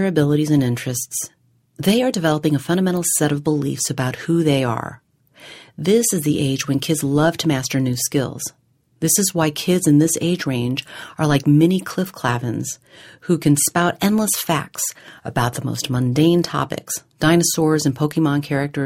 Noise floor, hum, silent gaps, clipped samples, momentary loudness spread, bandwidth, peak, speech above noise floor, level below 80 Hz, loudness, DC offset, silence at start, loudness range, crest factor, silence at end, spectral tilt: -45 dBFS; none; none; under 0.1%; 10 LU; 16.5 kHz; -2 dBFS; 26 dB; -52 dBFS; -19 LUFS; under 0.1%; 0 s; 2 LU; 16 dB; 0 s; -5 dB/octave